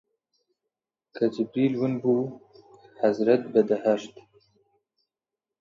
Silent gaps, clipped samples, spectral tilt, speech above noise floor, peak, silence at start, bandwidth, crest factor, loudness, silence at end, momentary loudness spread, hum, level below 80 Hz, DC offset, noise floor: none; under 0.1%; -7.5 dB/octave; 65 dB; -8 dBFS; 1.15 s; 7.6 kHz; 20 dB; -25 LUFS; 1.5 s; 7 LU; none; -74 dBFS; under 0.1%; -89 dBFS